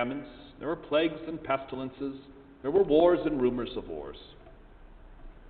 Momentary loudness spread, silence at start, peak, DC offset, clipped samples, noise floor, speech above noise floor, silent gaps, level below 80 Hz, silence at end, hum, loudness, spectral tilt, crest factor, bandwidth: 18 LU; 0 s; -10 dBFS; under 0.1%; under 0.1%; -51 dBFS; 22 dB; none; -52 dBFS; 0 s; none; -29 LUFS; -10 dB/octave; 20 dB; 4.6 kHz